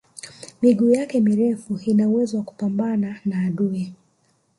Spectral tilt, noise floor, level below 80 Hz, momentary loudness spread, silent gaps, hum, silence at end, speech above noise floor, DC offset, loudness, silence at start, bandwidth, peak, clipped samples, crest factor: -7.5 dB/octave; -64 dBFS; -64 dBFS; 12 LU; none; none; 0.65 s; 44 dB; under 0.1%; -21 LUFS; 0.25 s; 11.5 kHz; -6 dBFS; under 0.1%; 16 dB